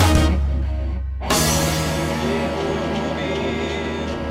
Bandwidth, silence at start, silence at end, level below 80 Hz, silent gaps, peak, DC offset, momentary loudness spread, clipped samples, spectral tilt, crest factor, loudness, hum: 16 kHz; 0 s; 0 s; -26 dBFS; none; -4 dBFS; under 0.1%; 8 LU; under 0.1%; -4.5 dB/octave; 16 dB; -21 LUFS; none